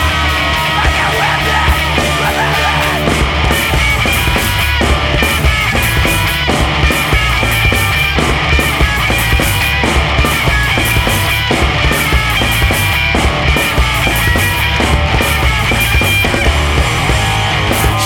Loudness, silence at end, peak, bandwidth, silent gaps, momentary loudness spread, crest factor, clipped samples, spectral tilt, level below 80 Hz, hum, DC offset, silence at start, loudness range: -11 LUFS; 0 s; 0 dBFS; 19.5 kHz; none; 1 LU; 12 dB; under 0.1%; -4 dB/octave; -18 dBFS; none; under 0.1%; 0 s; 0 LU